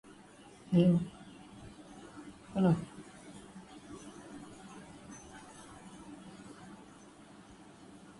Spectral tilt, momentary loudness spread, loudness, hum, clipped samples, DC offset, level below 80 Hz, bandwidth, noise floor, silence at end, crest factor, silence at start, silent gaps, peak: -7.5 dB/octave; 25 LU; -31 LUFS; none; under 0.1%; under 0.1%; -66 dBFS; 11.5 kHz; -56 dBFS; 1.45 s; 22 dB; 0.7 s; none; -16 dBFS